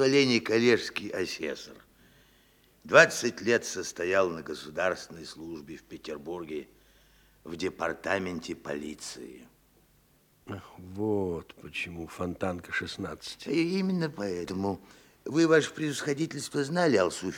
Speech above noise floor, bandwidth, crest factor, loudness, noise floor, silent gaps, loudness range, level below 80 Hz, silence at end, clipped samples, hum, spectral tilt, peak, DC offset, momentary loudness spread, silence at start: 35 dB; 19 kHz; 26 dB; -29 LUFS; -64 dBFS; none; 10 LU; -66 dBFS; 0 s; under 0.1%; none; -4.5 dB/octave; -4 dBFS; under 0.1%; 19 LU; 0 s